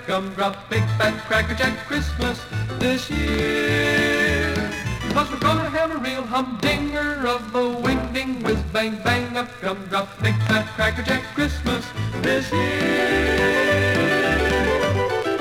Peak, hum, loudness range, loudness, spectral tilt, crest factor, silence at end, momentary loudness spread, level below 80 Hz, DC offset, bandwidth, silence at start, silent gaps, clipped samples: -8 dBFS; none; 3 LU; -21 LUFS; -5 dB/octave; 14 dB; 0 s; 7 LU; -36 dBFS; under 0.1%; 16.5 kHz; 0 s; none; under 0.1%